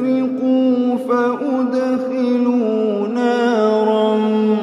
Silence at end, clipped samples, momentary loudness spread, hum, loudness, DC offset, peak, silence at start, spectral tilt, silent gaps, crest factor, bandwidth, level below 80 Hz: 0 s; under 0.1%; 3 LU; none; -17 LUFS; under 0.1%; -4 dBFS; 0 s; -7 dB/octave; none; 12 dB; 7.8 kHz; -72 dBFS